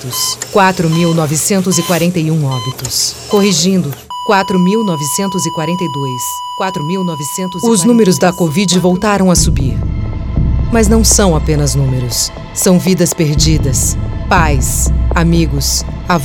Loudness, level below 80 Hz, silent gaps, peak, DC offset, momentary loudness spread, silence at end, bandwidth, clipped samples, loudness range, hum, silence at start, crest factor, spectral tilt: -12 LUFS; -20 dBFS; none; 0 dBFS; under 0.1%; 8 LU; 0 s; 18 kHz; under 0.1%; 3 LU; none; 0 s; 12 dB; -4.5 dB/octave